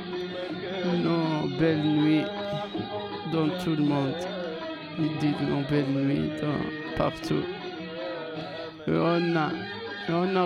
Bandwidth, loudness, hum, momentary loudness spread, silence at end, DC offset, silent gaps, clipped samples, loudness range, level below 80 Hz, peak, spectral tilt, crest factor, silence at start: 11 kHz; -28 LUFS; none; 10 LU; 0 s; under 0.1%; none; under 0.1%; 3 LU; -56 dBFS; -10 dBFS; -7.5 dB/octave; 18 dB; 0 s